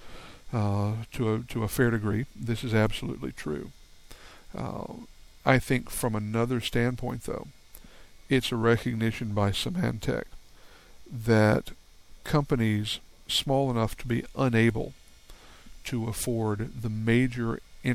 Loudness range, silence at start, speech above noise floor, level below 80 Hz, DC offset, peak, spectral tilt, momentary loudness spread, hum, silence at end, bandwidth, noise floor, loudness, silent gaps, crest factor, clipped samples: 3 LU; 0 s; 24 dB; -48 dBFS; under 0.1%; -8 dBFS; -6 dB/octave; 13 LU; none; 0 s; 16 kHz; -51 dBFS; -28 LUFS; none; 22 dB; under 0.1%